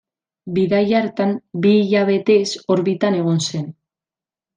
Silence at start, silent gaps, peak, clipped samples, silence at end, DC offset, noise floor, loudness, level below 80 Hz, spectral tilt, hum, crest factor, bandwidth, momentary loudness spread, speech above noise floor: 0.45 s; none; -4 dBFS; under 0.1%; 0.85 s; under 0.1%; under -90 dBFS; -18 LUFS; -62 dBFS; -6 dB/octave; none; 14 dB; 9.8 kHz; 8 LU; over 73 dB